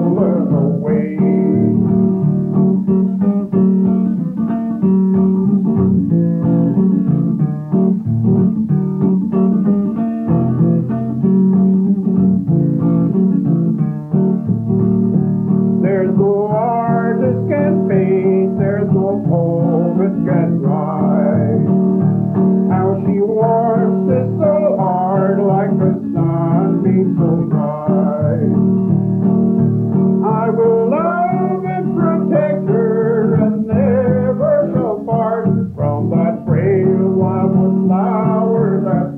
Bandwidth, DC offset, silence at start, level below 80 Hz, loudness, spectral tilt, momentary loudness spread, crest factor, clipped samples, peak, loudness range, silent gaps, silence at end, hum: 2.7 kHz; under 0.1%; 0 s; -52 dBFS; -15 LUFS; -13 dB/octave; 3 LU; 12 dB; under 0.1%; -2 dBFS; 1 LU; none; 0 s; none